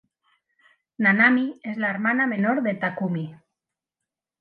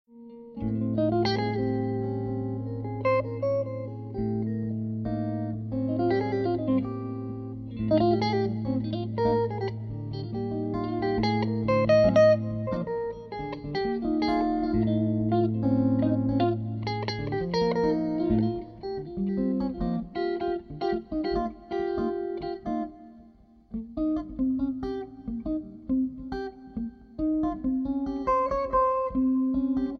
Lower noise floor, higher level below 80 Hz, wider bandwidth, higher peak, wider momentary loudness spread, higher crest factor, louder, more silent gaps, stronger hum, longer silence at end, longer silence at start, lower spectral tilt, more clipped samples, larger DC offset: first, -87 dBFS vs -55 dBFS; second, -76 dBFS vs -48 dBFS; second, 4.7 kHz vs 6.6 kHz; first, -6 dBFS vs -10 dBFS; about the same, 12 LU vs 11 LU; about the same, 20 dB vs 16 dB; first, -22 LUFS vs -28 LUFS; neither; neither; first, 1.05 s vs 0 s; first, 1 s vs 0.15 s; about the same, -9 dB/octave vs -8.5 dB/octave; neither; neither